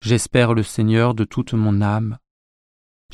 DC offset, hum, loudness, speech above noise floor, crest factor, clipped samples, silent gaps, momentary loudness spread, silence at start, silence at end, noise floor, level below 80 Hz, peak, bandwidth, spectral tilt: under 0.1%; none; -19 LUFS; over 72 dB; 16 dB; under 0.1%; none; 7 LU; 0.05 s; 0.95 s; under -90 dBFS; -46 dBFS; -2 dBFS; 12.5 kHz; -6 dB/octave